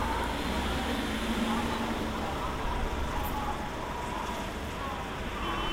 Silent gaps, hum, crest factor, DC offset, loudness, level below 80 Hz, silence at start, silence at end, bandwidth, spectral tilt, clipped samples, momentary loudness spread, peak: none; none; 14 dB; under 0.1%; -33 LUFS; -38 dBFS; 0 s; 0 s; 16 kHz; -5 dB/octave; under 0.1%; 5 LU; -18 dBFS